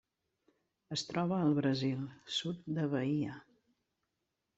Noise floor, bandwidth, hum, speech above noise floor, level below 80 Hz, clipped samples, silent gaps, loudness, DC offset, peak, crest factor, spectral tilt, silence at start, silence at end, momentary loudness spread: -86 dBFS; 8.2 kHz; none; 51 dB; -74 dBFS; under 0.1%; none; -35 LUFS; under 0.1%; -20 dBFS; 18 dB; -6 dB/octave; 0.9 s; 1.15 s; 10 LU